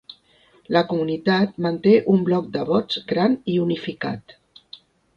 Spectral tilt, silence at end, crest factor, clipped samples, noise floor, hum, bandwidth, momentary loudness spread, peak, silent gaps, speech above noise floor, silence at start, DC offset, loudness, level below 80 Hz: -8 dB/octave; 0.4 s; 18 dB; under 0.1%; -57 dBFS; none; 7 kHz; 10 LU; -4 dBFS; none; 37 dB; 0.7 s; under 0.1%; -21 LUFS; -62 dBFS